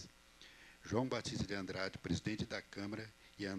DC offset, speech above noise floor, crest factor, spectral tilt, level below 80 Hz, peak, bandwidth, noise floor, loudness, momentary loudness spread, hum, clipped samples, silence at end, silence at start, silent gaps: under 0.1%; 21 dB; 22 dB; -5 dB/octave; -64 dBFS; -22 dBFS; 13 kHz; -62 dBFS; -42 LUFS; 18 LU; none; under 0.1%; 0 s; 0 s; none